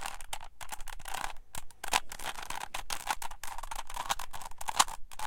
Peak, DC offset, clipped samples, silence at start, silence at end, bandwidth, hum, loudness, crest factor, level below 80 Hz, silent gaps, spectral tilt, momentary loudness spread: -6 dBFS; under 0.1%; under 0.1%; 0 s; 0 s; 17 kHz; none; -36 LUFS; 28 dB; -46 dBFS; none; 0 dB/octave; 14 LU